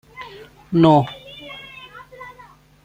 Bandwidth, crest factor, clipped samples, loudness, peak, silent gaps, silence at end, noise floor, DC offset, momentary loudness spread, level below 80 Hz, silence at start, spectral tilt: 15.5 kHz; 20 dB; under 0.1%; -16 LUFS; -2 dBFS; none; 0.55 s; -47 dBFS; under 0.1%; 25 LU; -54 dBFS; 0.2 s; -8.5 dB/octave